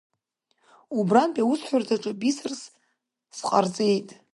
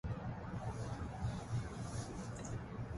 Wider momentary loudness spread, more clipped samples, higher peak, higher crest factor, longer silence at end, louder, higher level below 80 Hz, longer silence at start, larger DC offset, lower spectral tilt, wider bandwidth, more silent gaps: first, 13 LU vs 3 LU; neither; first, -6 dBFS vs -30 dBFS; first, 20 dB vs 14 dB; first, 0.2 s vs 0 s; first, -25 LUFS vs -44 LUFS; second, -76 dBFS vs -52 dBFS; first, 0.9 s vs 0.05 s; neither; about the same, -5.5 dB/octave vs -6.5 dB/octave; about the same, 11.5 kHz vs 11.5 kHz; neither